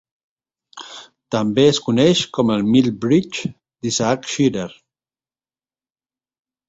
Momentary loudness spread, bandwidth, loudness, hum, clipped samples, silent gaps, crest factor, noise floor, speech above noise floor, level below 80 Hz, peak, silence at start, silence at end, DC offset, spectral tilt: 20 LU; 8 kHz; -18 LUFS; none; under 0.1%; none; 18 dB; under -90 dBFS; over 73 dB; -56 dBFS; -2 dBFS; 0.75 s; 1.95 s; under 0.1%; -5 dB/octave